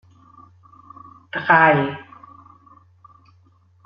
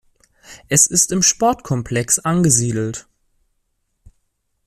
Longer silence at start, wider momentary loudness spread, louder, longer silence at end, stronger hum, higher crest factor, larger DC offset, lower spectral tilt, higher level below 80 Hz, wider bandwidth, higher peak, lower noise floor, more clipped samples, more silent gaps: first, 1.35 s vs 0.5 s; first, 18 LU vs 11 LU; about the same, -17 LUFS vs -16 LUFS; first, 1.85 s vs 1.65 s; neither; about the same, 22 dB vs 20 dB; neither; about the same, -4 dB/octave vs -3.5 dB/octave; second, -64 dBFS vs -48 dBFS; second, 5.8 kHz vs 15.5 kHz; about the same, -2 dBFS vs 0 dBFS; second, -56 dBFS vs -69 dBFS; neither; neither